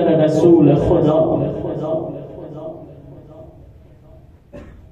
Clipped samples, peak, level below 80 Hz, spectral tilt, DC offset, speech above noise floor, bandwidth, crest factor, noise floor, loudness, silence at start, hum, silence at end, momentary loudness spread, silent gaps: under 0.1%; -2 dBFS; -40 dBFS; -9 dB/octave; under 0.1%; 31 dB; 8.4 kHz; 16 dB; -44 dBFS; -15 LUFS; 0 s; none; 0.2 s; 21 LU; none